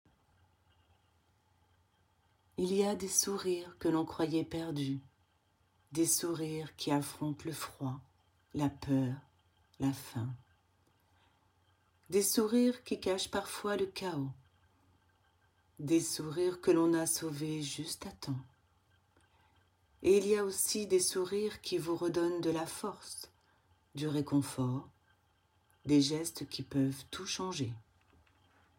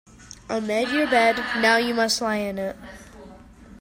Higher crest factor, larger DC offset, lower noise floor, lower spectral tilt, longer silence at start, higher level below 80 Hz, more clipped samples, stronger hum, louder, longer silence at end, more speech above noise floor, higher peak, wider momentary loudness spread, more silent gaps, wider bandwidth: about the same, 22 dB vs 18 dB; neither; first, -74 dBFS vs -46 dBFS; first, -4.5 dB/octave vs -3 dB/octave; first, 2.6 s vs 0.2 s; second, -68 dBFS vs -54 dBFS; neither; neither; second, -34 LUFS vs -22 LUFS; first, 0.95 s vs 0.05 s; first, 40 dB vs 23 dB; second, -14 dBFS vs -6 dBFS; second, 12 LU vs 22 LU; neither; about the same, 17 kHz vs 16 kHz